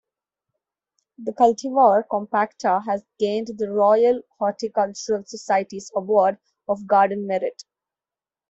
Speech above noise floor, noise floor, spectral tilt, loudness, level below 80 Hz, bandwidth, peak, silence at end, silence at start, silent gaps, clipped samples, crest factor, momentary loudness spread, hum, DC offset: over 69 dB; under -90 dBFS; -5 dB/octave; -21 LUFS; -68 dBFS; 8 kHz; -4 dBFS; 0.95 s; 1.2 s; none; under 0.1%; 18 dB; 11 LU; none; under 0.1%